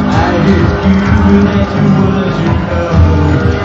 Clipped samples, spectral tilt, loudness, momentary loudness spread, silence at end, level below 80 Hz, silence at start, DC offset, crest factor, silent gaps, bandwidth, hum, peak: 0.2%; -8 dB/octave; -10 LUFS; 4 LU; 0 s; -20 dBFS; 0 s; 0.4%; 8 dB; none; 7.2 kHz; none; 0 dBFS